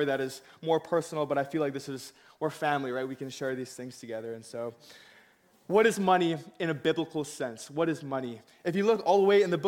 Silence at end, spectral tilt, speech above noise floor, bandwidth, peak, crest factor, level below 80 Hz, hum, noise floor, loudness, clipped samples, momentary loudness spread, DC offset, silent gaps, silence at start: 0 s; -5.5 dB/octave; 33 dB; 16.5 kHz; -10 dBFS; 18 dB; -74 dBFS; none; -63 dBFS; -30 LUFS; under 0.1%; 15 LU; under 0.1%; none; 0 s